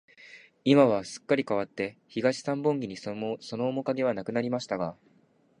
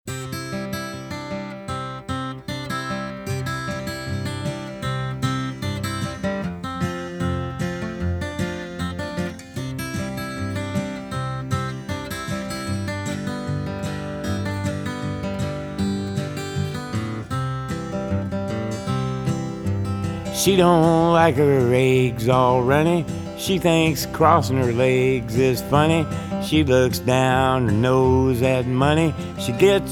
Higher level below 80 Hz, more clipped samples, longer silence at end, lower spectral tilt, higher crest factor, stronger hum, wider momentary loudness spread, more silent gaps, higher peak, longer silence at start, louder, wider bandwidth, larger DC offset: second, -70 dBFS vs -44 dBFS; neither; first, 0.65 s vs 0 s; about the same, -6 dB/octave vs -6 dB/octave; about the same, 22 dB vs 20 dB; neither; about the same, 12 LU vs 12 LU; neither; second, -8 dBFS vs -2 dBFS; first, 0.2 s vs 0.05 s; second, -28 LUFS vs -22 LUFS; second, 10.5 kHz vs 18.5 kHz; neither